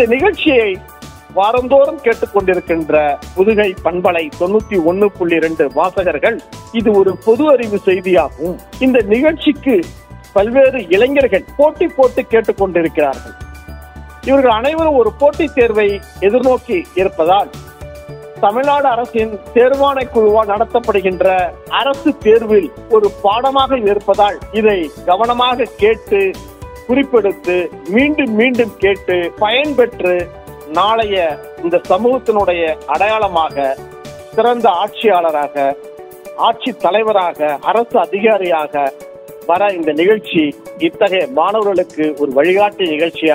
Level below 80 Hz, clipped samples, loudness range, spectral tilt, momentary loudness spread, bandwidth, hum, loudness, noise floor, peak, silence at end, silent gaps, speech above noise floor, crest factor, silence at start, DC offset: -40 dBFS; under 0.1%; 2 LU; -6 dB/octave; 8 LU; 16 kHz; none; -14 LUFS; -33 dBFS; 0 dBFS; 0 s; none; 20 dB; 14 dB; 0 s; under 0.1%